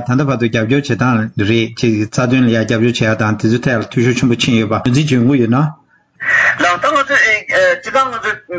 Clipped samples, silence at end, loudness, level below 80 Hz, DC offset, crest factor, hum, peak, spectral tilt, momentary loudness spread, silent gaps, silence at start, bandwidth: under 0.1%; 0 s; -13 LUFS; -44 dBFS; under 0.1%; 12 dB; none; 0 dBFS; -5.5 dB/octave; 5 LU; none; 0 s; 8 kHz